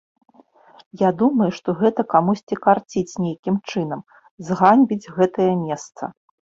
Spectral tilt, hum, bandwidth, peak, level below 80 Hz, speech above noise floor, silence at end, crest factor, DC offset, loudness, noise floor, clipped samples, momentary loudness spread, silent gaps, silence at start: -7 dB/octave; none; 7.8 kHz; -2 dBFS; -62 dBFS; 32 dB; 0.45 s; 18 dB; under 0.1%; -20 LUFS; -51 dBFS; under 0.1%; 13 LU; 2.43-2.47 s, 3.39-3.43 s, 4.31-4.38 s; 0.95 s